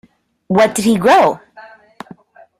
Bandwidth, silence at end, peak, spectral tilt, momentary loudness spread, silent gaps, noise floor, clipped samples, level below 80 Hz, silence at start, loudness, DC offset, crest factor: 15 kHz; 1 s; 0 dBFS; -5 dB/octave; 8 LU; none; -42 dBFS; under 0.1%; -54 dBFS; 0.5 s; -13 LUFS; under 0.1%; 16 dB